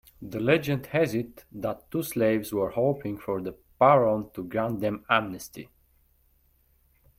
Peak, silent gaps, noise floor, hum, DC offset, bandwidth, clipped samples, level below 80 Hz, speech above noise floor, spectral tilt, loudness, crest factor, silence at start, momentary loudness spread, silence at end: -6 dBFS; none; -65 dBFS; none; under 0.1%; 16.5 kHz; under 0.1%; -58 dBFS; 39 dB; -6 dB/octave; -26 LUFS; 22 dB; 0.2 s; 16 LU; 1.55 s